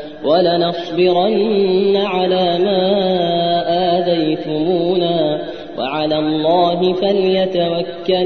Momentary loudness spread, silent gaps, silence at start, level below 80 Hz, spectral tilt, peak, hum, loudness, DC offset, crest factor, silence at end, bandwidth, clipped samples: 5 LU; none; 0 s; -54 dBFS; -8 dB/octave; -2 dBFS; none; -16 LUFS; 0.6%; 12 dB; 0 s; 6.2 kHz; under 0.1%